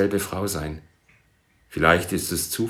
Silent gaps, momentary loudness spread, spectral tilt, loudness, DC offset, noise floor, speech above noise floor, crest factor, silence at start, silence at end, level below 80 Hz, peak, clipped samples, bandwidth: none; 16 LU; -4 dB/octave; -23 LUFS; under 0.1%; -62 dBFS; 39 dB; 24 dB; 0 s; 0 s; -48 dBFS; -2 dBFS; under 0.1%; over 20 kHz